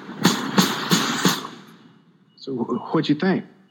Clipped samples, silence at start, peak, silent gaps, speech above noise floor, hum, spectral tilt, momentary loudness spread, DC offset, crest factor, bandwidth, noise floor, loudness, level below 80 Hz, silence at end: under 0.1%; 0 s; -2 dBFS; none; 32 dB; none; -4 dB/octave; 11 LU; under 0.1%; 22 dB; 17.5 kHz; -54 dBFS; -22 LUFS; -74 dBFS; 0.25 s